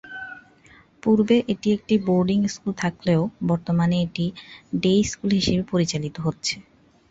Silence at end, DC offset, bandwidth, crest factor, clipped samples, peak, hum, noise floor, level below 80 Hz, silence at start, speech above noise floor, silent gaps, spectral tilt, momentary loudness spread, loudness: 0.5 s; under 0.1%; 8 kHz; 16 dB; under 0.1%; -8 dBFS; none; -53 dBFS; -50 dBFS; 0.05 s; 31 dB; none; -6 dB/octave; 9 LU; -23 LUFS